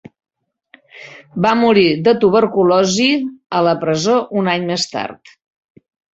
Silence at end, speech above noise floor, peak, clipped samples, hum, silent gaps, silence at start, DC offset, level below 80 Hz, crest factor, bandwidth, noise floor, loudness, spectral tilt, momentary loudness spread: 1 s; 36 dB; -2 dBFS; under 0.1%; none; none; 0.95 s; under 0.1%; -56 dBFS; 16 dB; 8.2 kHz; -51 dBFS; -15 LUFS; -5 dB/octave; 12 LU